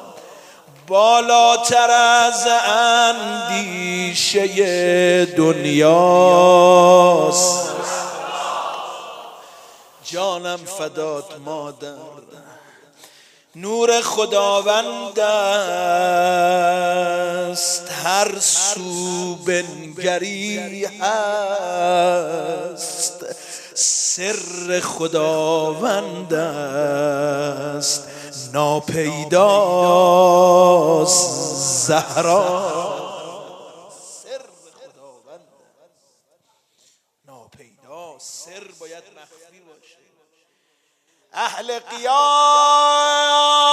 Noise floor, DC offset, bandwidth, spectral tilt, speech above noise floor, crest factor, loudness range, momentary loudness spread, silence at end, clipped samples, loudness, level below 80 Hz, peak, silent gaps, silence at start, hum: -65 dBFS; under 0.1%; 15.5 kHz; -2.5 dB/octave; 49 dB; 18 dB; 14 LU; 18 LU; 0 s; under 0.1%; -16 LUFS; -70 dBFS; 0 dBFS; none; 0 s; none